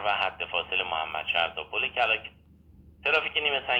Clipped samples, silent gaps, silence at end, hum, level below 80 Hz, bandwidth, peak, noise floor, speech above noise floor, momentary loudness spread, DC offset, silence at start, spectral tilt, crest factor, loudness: under 0.1%; none; 0 s; none; -60 dBFS; 16 kHz; -8 dBFS; -54 dBFS; 26 dB; 6 LU; under 0.1%; 0 s; -3.5 dB/octave; 20 dB; -27 LUFS